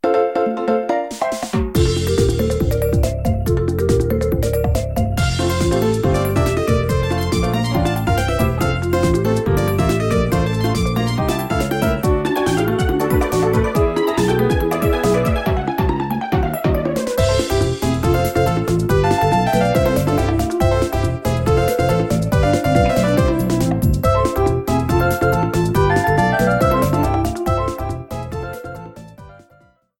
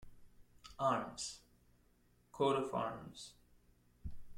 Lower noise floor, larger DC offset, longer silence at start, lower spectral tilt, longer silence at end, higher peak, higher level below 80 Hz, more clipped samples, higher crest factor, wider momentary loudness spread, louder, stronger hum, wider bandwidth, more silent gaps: second, -53 dBFS vs -71 dBFS; neither; about the same, 0.05 s vs 0 s; first, -6.5 dB/octave vs -4.5 dB/octave; first, 0.65 s vs 0 s; first, -2 dBFS vs -22 dBFS; first, -26 dBFS vs -62 dBFS; neither; second, 14 dB vs 20 dB; second, 4 LU vs 20 LU; first, -18 LUFS vs -39 LUFS; neither; about the same, 17 kHz vs 16.5 kHz; neither